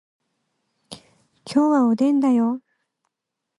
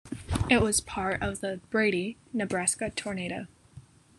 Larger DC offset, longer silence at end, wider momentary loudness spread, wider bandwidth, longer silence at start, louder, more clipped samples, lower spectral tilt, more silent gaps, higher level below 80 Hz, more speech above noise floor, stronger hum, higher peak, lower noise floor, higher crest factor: neither; first, 1 s vs 0.35 s; second, 7 LU vs 11 LU; second, 11.5 kHz vs 13 kHz; first, 0.9 s vs 0.05 s; first, -19 LUFS vs -29 LUFS; neither; first, -6.5 dB/octave vs -4 dB/octave; neither; second, -70 dBFS vs -46 dBFS; first, 65 dB vs 24 dB; neither; about the same, -8 dBFS vs -8 dBFS; first, -82 dBFS vs -53 dBFS; second, 16 dB vs 22 dB